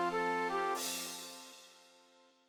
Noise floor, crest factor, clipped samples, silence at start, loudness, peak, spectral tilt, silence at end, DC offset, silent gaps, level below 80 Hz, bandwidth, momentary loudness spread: -66 dBFS; 16 dB; under 0.1%; 0 s; -37 LUFS; -24 dBFS; -2 dB/octave; 0.65 s; under 0.1%; none; -76 dBFS; over 20 kHz; 19 LU